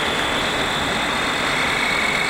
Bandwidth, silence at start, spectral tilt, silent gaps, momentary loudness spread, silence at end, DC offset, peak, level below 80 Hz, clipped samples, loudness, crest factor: 16 kHz; 0 s; -2.5 dB/octave; none; 2 LU; 0 s; under 0.1%; -8 dBFS; -40 dBFS; under 0.1%; -19 LUFS; 12 dB